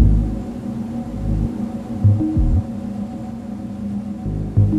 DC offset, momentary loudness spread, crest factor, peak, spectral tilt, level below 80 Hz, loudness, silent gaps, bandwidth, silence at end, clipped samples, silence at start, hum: under 0.1%; 11 LU; 18 dB; -2 dBFS; -10 dB/octave; -26 dBFS; -22 LUFS; none; 7.8 kHz; 0 s; under 0.1%; 0 s; none